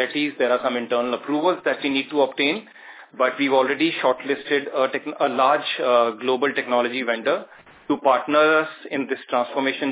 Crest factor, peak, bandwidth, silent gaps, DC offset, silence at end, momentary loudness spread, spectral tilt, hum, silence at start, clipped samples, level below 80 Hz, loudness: 18 dB; -4 dBFS; 4 kHz; none; under 0.1%; 0 s; 6 LU; -8 dB/octave; none; 0 s; under 0.1%; -76 dBFS; -21 LUFS